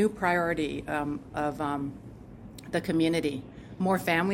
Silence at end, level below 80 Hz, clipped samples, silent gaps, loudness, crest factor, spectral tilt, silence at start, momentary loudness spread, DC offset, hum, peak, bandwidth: 0 s; -54 dBFS; under 0.1%; none; -29 LUFS; 18 dB; -6 dB/octave; 0 s; 20 LU; under 0.1%; none; -12 dBFS; 16.5 kHz